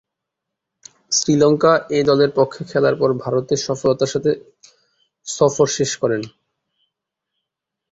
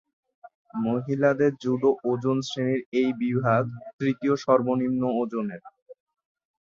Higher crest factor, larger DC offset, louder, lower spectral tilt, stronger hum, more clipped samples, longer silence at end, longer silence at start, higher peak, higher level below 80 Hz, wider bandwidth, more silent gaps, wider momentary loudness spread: about the same, 18 dB vs 20 dB; neither; first, -18 LUFS vs -25 LUFS; second, -4.5 dB/octave vs -7.5 dB/octave; neither; neither; first, 1.65 s vs 0.7 s; first, 1.1 s vs 0.45 s; first, -2 dBFS vs -6 dBFS; first, -56 dBFS vs -66 dBFS; about the same, 8 kHz vs 7.6 kHz; second, none vs 0.55-0.65 s, 2.86-2.92 s, 3.93-3.99 s, 5.82-5.86 s; about the same, 8 LU vs 8 LU